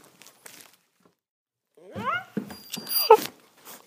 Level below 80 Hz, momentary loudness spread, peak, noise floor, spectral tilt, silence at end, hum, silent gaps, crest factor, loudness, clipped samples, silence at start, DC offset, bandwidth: -74 dBFS; 28 LU; 0 dBFS; -66 dBFS; -3 dB/octave; 0.1 s; none; none; 28 dB; -24 LUFS; under 0.1%; 1.9 s; under 0.1%; 15.5 kHz